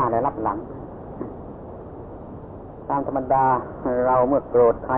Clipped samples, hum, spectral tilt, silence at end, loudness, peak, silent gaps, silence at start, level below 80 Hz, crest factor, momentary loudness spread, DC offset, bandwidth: under 0.1%; none; -12.5 dB/octave; 0 s; -21 LUFS; -8 dBFS; none; 0 s; -46 dBFS; 16 dB; 19 LU; under 0.1%; 3.3 kHz